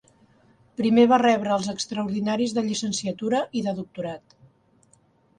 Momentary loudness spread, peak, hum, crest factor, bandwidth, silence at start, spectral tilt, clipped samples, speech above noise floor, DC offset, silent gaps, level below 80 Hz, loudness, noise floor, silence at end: 16 LU; -6 dBFS; none; 18 dB; 10 kHz; 0.8 s; -4.5 dB/octave; under 0.1%; 38 dB; under 0.1%; none; -66 dBFS; -24 LUFS; -61 dBFS; 1.2 s